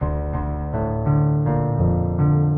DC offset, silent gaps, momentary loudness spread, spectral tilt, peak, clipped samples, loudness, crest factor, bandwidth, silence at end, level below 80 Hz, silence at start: under 0.1%; none; 7 LU; -15 dB/octave; -8 dBFS; under 0.1%; -21 LUFS; 12 dB; 2.4 kHz; 0 s; -30 dBFS; 0 s